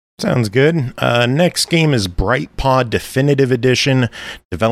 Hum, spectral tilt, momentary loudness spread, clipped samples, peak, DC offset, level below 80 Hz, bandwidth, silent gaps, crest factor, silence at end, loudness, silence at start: none; -5.5 dB/octave; 5 LU; under 0.1%; -2 dBFS; under 0.1%; -32 dBFS; 15 kHz; 4.45-4.50 s; 14 dB; 0 s; -15 LUFS; 0.2 s